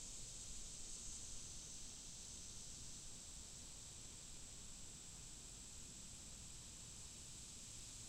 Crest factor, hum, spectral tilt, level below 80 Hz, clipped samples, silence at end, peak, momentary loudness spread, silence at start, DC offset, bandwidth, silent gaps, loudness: 16 dB; none; -1.5 dB/octave; -62 dBFS; under 0.1%; 0 s; -38 dBFS; 3 LU; 0 s; under 0.1%; 16 kHz; none; -53 LUFS